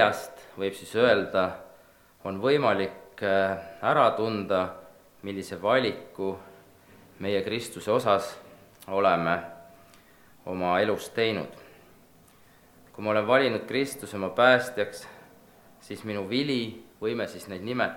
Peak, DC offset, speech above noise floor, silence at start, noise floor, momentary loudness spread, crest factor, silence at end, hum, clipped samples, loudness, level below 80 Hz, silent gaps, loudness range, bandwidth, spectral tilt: -4 dBFS; under 0.1%; 30 dB; 0 s; -57 dBFS; 17 LU; 24 dB; 0 s; none; under 0.1%; -27 LUFS; -66 dBFS; none; 5 LU; 19 kHz; -5 dB/octave